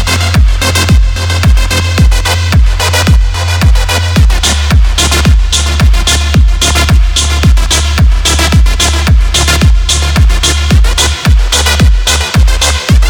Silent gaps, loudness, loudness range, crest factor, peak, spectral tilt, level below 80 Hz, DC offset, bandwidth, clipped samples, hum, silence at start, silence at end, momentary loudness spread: none; -8 LUFS; 1 LU; 6 dB; 0 dBFS; -3.5 dB/octave; -8 dBFS; under 0.1%; 19 kHz; under 0.1%; none; 0 s; 0 s; 2 LU